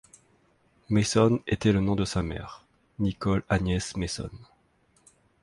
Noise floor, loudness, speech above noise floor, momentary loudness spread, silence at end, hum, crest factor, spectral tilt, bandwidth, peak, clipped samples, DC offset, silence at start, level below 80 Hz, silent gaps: -66 dBFS; -27 LUFS; 40 dB; 12 LU; 1 s; none; 20 dB; -6 dB/octave; 11.5 kHz; -8 dBFS; under 0.1%; under 0.1%; 0.9 s; -44 dBFS; none